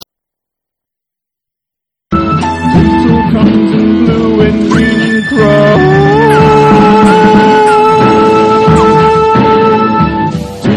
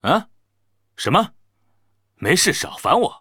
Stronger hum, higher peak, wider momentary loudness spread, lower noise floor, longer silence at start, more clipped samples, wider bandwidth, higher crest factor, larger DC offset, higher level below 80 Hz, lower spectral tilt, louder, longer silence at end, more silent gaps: neither; about the same, 0 dBFS vs -2 dBFS; second, 6 LU vs 10 LU; first, -81 dBFS vs -71 dBFS; first, 2.1 s vs 0.05 s; first, 2% vs under 0.1%; second, 12 kHz vs over 20 kHz; second, 8 dB vs 20 dB; neither; first, -28 dBFS vs -56 dBFS; first, -7 dB/octave vs -3.5 dB/octave; first, -7 LUFS vs -19 LUFS; about the same, 0 s vs 0.05 s; neither